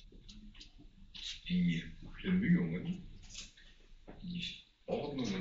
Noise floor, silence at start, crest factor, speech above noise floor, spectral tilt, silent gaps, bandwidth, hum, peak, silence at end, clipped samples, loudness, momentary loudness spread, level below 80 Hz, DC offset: -58 dBFS; 0 s; 18 dB; 24 dB; -6 dB/octave; none; 7.6 kHz; none; -20 dBFS; 0 s; under 0.1%; -37 LUFS; 23 LU; -56 dBFS; under 0.1%